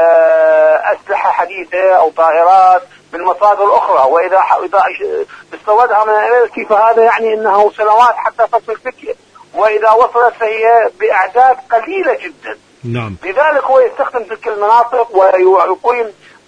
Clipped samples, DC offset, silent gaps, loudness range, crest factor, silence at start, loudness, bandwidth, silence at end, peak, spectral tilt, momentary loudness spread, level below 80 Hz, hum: under 0.1%; under 0.1%; none; 3 LU; 10 dB; 0 s; -11 LUFS; 9.6 kHz; 0.35 s; 0 dBFS; -6 dB/octave; 13 LU; -56 dBFS; none